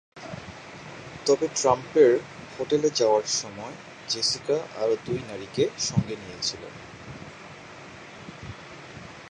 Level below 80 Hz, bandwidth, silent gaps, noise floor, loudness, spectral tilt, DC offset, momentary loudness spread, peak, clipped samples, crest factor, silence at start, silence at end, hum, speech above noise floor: -58 dBFS; 9.8 kHz; none; -44 dBFS; -25 LUFS; -4 dB/octave; under 0.1%; 20 LU; -6 dBFS; under 0.1%; 22 dB; 0.15 s; 0 s; none; 19 dB